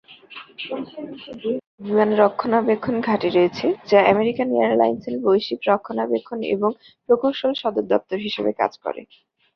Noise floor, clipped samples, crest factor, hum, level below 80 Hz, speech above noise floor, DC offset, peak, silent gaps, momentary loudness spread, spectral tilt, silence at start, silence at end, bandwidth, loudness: -42 dBFS; under 0.1%; 18 dB; none; -62 dBFS; 22 dB; under 0.1%; -2 dBFS; 1.67-1.78 s; 14 LU; -7 dB/octave; 0.1 s; 0.5 s; 6.4 kHz; -21 LUFS